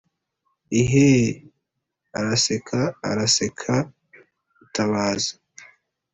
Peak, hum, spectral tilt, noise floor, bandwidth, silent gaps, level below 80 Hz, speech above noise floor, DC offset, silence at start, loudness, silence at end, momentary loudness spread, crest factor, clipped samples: -6 dBFS; none; -4.5 dB/octave; -79 dBFS; 8.4 kHz; none; -54 dBFS; 58 dB; under 0.1%; 0.7 s; -21 LUFS; 0.5 s; 12 LU; 18 dB; under 0.1%